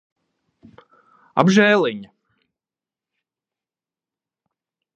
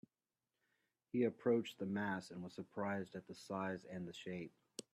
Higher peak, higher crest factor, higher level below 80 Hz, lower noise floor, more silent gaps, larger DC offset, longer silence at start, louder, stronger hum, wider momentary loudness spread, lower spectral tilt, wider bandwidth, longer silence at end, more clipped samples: first, 0 dBFS vs -24 dBFS; about the same, 24 dB vs 20 dB; first, -68 dBFS vs -84 dBFS; about the same, under -90 dBFS vs under -90 dBFS; neither; neither; first, 1.35 s vs 1.15 s; first, -17 LUFS vs -43 LUFS; neither; about the same, 13 LU vs 13 LU; about the same, -5.5 dB/octave vs -6 dB/octave; second, 8.2 kHz vs 13.5 kHz; first, 2.9 s vs 0.15 s; neither